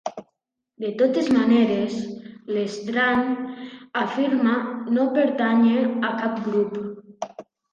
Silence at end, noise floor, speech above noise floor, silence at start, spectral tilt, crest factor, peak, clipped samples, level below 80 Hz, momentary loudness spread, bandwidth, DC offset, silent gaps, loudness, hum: 0.3 s; -75 dBFS; 54 dB; 0.05 s; -6 dB/octave; 14 dB; -8 dBFS; under 0.1%; -66 dBFS; 17 LU; 7.4 kHz; under 0.1%; none; -22 LUFS; none